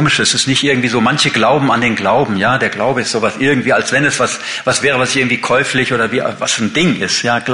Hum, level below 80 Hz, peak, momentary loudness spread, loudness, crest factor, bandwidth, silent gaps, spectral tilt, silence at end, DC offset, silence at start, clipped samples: none; -48 dBFS; -2 dBFS; 4 LU; -13 LUFS; 12 dB; 11 kHz; none; -3.5 dB/octave; 0 s; under 0.1%; 0 s; under 0.1%